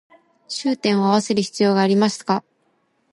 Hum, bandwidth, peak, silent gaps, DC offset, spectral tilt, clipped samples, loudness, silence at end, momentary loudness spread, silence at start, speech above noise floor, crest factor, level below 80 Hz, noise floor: none; 11.5 kHz; -4 dBFS; none; under 0.1%; -5 dB/octave; under 0.1%; -19 LUFS; 0.7 s; 8 LU; 0.5 s; 47 dB; 16 dB; -68 dBFS; -65 dBFS